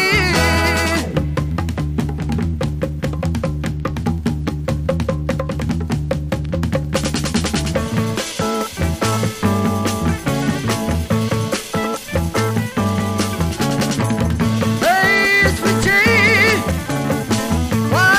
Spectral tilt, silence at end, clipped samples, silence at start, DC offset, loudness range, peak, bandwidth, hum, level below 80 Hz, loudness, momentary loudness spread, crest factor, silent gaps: -5 dB/octave; 0 s; under 0.1%; 0 s; under 0.1%; 7 LU; -4 dBFS; 15.5 kHz; none; -30 dBFS; -18 LUFS; 9 LU; 14 dB; none